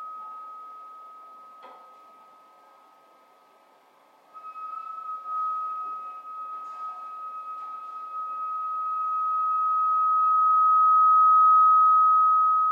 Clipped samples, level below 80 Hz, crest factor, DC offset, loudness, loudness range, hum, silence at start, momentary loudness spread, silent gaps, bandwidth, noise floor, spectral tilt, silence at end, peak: under 0.1%; under -90 dBFS; 12 dB; under 0.1%; -20 LUFS; 23 LU; none; 0 s; 22 LU; none; 4 kHz; -59 dBFS; -2 dB/octave; 0 s; -14 dBFS